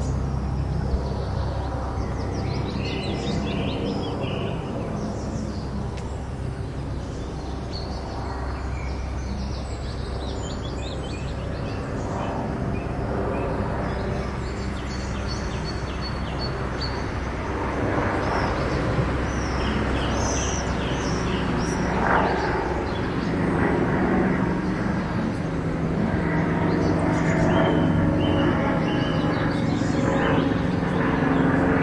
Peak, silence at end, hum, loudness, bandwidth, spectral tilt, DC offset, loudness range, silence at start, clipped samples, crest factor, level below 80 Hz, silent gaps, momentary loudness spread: -6 dBFS; 0 s; none; -25 LUFS; 11 kHz; -6.5 dB/octave; under 0.1%; 9 LU; 0 s; under 0.1%; 18 dB; -34 dBFS; none; 9 LU